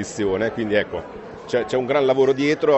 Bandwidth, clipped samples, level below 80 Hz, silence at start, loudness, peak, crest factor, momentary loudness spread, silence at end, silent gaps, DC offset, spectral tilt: 8.2 kHz; under 0.1%; -52 dBFS; 0 s; -21 LUFS; -6 dBFS; 14 dB; 13 LU; 0 s; none; under 0.1%; -5.5 dB/octave